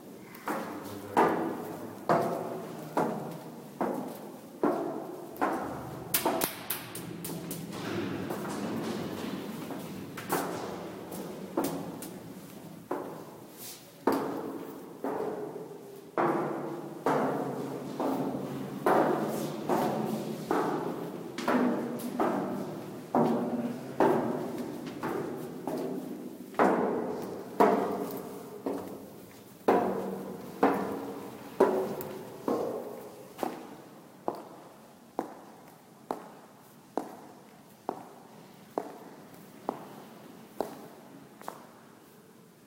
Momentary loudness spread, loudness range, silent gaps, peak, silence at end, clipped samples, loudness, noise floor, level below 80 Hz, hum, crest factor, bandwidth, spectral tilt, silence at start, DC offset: 20 LU; 12 LU; none; -6 dBFS; 0 s; under 0.1%; -33 LUFS; -55 dBFS; -72 dBFS; none; 26 dB; 16 kHz; -5.5 dB/octave; 0 s; under 0.1%